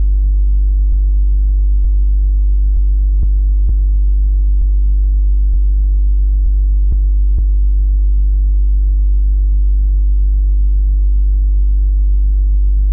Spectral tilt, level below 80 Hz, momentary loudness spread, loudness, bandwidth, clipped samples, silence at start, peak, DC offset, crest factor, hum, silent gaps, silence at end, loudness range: -21.5 dB/octave; -10 dBFS; 0 LU; -15 LUFS; 0.4 kHz; under 0.1%; 0 s; -6 dBFS; under 0.1%; 4 dB; none; none; 0 s; 0 LU